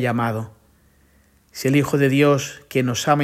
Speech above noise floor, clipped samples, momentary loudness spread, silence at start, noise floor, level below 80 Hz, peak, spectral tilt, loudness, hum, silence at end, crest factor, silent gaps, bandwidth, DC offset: 38 dB; under 0.1%; 13 LU; 0 s; -57 dBFS; -58 dBFS; -4 dBFS; -5.5 dB/octave; -20 LUFS; none; 0 s; 18 dB; none; 16 kHz; under 0.1%